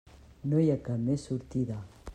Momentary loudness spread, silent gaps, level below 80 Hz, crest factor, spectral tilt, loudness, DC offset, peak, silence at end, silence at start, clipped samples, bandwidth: 11 LU; none; -54 dBFS; 16 dB; -9 dB/octave; -31 LUFS; under 0.1%; -16 dBFS; 0 s; 0.45 s; under 0.1%; 9.8 kHz